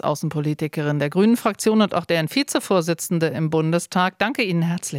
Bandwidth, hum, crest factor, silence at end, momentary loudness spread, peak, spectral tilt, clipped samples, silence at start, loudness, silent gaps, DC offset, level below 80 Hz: 16.5 kHz; none; 16 dB; 0 s; 5 LU; -6 dBFS; -5.5 dB/octave; under 0.1%; 0.05 s; -21 LUFS; none; under 0.1%; -66 dBFS